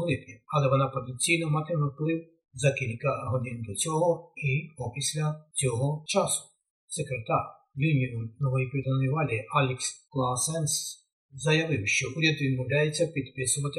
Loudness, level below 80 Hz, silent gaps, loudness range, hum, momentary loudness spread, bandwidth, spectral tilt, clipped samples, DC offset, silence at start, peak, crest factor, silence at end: -28 LUFS; -64 dBFS; 6.70-6.88 s, 11.13-11.29 s; 2 LU; none; 8 LU; 12.5 kHz; -4.5 dB/octave; under 0.1%; under 0.1%; 0 s; -10 dBFS; 18 dB; 0 s